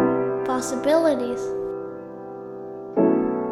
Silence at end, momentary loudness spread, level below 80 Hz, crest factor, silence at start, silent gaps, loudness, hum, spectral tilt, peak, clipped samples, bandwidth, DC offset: 0 s; 16 LU; -58 dBFS; 16 dB; 0 s; none; -23 LUFS; none; -5.5 dB/octave; -8 dBFS; under 0.1%; 13.5 kHz; under 0.1%